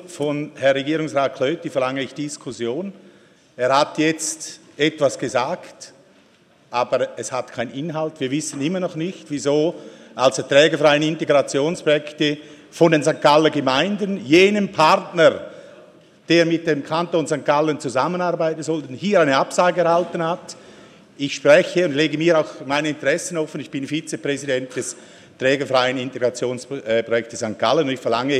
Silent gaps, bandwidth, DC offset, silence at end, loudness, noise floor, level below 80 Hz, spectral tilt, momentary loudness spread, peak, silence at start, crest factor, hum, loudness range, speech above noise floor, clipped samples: none; 13.5 kHz; under 0.1%; 0 s; -20 LUFS; -54 dBFS; -66 dBFS; -4.5 dB/octave; 13 LU; 0 dBFS; 0 s; 20 dB; none; 7 LU; 35 dB; under 0.1%